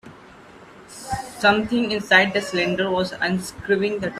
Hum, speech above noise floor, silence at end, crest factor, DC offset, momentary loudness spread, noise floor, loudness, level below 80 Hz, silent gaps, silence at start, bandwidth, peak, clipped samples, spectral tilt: none; 25 dB; 0 s; 22 dB; under 0.1%; 14 LU; -45 dBFS; -21 LUFS; -52 dBFS; none; 0.05 s; 14.5 kHz; -2 dBFS; under 0.1%; -4.5 dB/octave